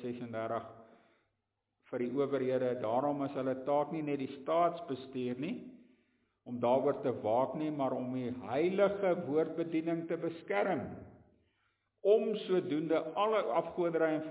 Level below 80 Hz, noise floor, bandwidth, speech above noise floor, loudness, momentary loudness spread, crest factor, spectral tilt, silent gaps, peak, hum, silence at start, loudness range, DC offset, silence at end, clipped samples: -74 dBFS; -85 dBFS; 4 kHz; 51 dB; -34 LUFS; 10 LU; 18 dB; -5.5 dB/octave; none; -16 dBFS; none; 0 s; 3 LU; under 0.1%; 0 s; under 0.1%